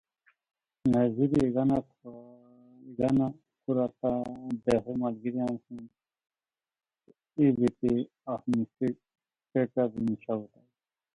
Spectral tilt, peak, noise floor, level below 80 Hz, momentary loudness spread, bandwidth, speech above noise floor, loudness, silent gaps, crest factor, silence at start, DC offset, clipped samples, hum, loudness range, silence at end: -9 dB/octave; -12 dBFS; under -90 dBFS; -60 dBFS; 17 LU; 11 kHz; over 61 dB; -29 LUFS; none; 18 dB; 0.85 s; under 0.1%; under 0.1%; none; 4 LU; 0.7 s